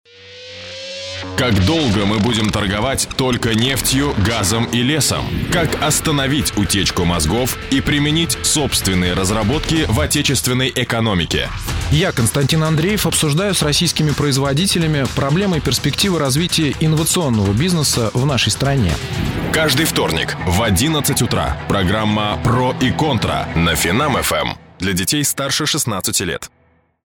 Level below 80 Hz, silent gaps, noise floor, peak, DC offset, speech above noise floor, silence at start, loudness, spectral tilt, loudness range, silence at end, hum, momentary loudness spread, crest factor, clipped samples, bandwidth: -32 dBFS; none; -37 dBFS; -4 dBFS; under 0.1%; 21 dB; 0.2 s; -16 LUFS; -4 dB/octave; 1 LU; 0.6 s; none; 4 LU; 14 dB; under 0.1%; 19.5 kHz